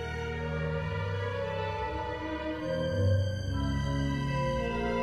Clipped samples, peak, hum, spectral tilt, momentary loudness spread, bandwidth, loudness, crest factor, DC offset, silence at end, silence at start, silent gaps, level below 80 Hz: under 0.1%; -16 dBFS; none; -7 dB/octave; 6 LU; 9.8 kHz; -32 LUFS; 14 dB; under 0.1%; 0 s; 0 s; none; -42 dBFS